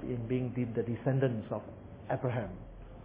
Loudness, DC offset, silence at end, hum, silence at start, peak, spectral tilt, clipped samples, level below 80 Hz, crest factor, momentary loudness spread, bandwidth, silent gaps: -35 LUFS; under 0.1%; 0 s; none; 0 s; -16 dBFS; -8.5 dB/octave; under 0.1%; -54 dBFS; 18 dB; 18 LU; 3.7 kHz; none